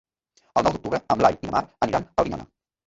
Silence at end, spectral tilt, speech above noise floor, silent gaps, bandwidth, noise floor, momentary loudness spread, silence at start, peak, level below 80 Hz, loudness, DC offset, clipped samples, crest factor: 0.45 s; -6 dB/octave; 42 dB; none; 8 kHz; -65 dBFS; 8 LU; 0.55 s; -4 dBFS; -48 dBFS; -24 LUFS; under 0.1%; under 0.1%; 20 dB